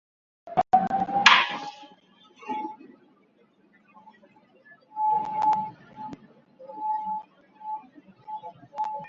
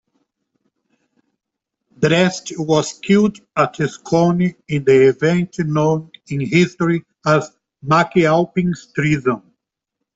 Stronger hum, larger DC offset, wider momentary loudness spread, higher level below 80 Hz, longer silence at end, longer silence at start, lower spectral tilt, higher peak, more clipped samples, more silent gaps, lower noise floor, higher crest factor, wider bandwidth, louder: neither; neither; first, 23 LU vs 9 LU; second, -68 dBFS vs -54 dBFS; second, 0 s vs 0.75 s; second, 0.45 s vs 2 s; second, -2.5 dB/octave vs -6 dB/octave; about the same, -2 dBFS vs -2 dBFS; neither; neither; second, -62 dBFS vs -81 dBFS; first, 28 dB vs 16 dB; about the same, 7.8 kHz vs 8 kHz; second, -25 LUFS vs -17 LUFS